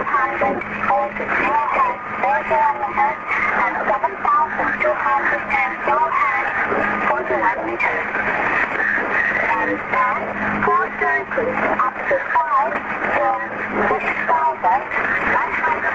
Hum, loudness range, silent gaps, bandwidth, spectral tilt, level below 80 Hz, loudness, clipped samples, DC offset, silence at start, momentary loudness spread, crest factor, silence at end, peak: none; 1 LU; none; 7.8 kHz; -6 dB/octave; -50 dBFS; -18 LUFS; under 0.1%; under 0.1%; 0 s; 3 LU; 14 dB; 0 s; -6 dBFS